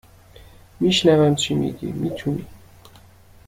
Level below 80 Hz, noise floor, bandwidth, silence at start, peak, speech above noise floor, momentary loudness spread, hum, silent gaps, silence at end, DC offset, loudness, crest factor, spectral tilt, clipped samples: -50 dBFS; -48 dBFS; 16 kHz; 0.4 s; -4 dBFS; 29 dB; 12 LU; none; none; 0.9 s; under 0.1%; -20 LUFS; 18 dB; -5.5 dB/octave; under 0.1%